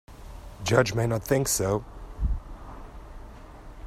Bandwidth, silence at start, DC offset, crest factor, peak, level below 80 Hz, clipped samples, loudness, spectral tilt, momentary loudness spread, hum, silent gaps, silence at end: 16 kHz; 0.1 s; under 0.1%; 22 dB; -6 dBFS; -38 dBFS; under 0.1%; -26 LUFS; -4.5 dB/octave; 23 LU; none; none; 0 s